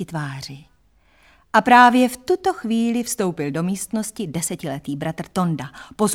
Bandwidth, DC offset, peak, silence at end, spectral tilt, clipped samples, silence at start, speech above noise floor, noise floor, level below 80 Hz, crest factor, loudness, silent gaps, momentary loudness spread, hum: 17 kHz; under 0.1%; -2 dBFS; 0 s; -4.5 dB/octave; under 0.1%; 0 s; 38 dB; -58 dBFS; -56 dBFS; 20 dB; -20 LUFS; none; 16 LU; none